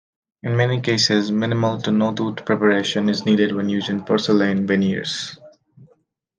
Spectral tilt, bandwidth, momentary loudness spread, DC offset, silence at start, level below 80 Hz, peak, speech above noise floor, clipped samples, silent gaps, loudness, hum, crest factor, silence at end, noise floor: -5.5 dB/octave; 9.6 kHz; 7 LU; under 0.1%; 0.45 s; -64 dBFS; -4 dBFS; 42 dB; under 0.1%; none; -19 LUFS; none; 16 dB; 0.55 s; -61 dBFS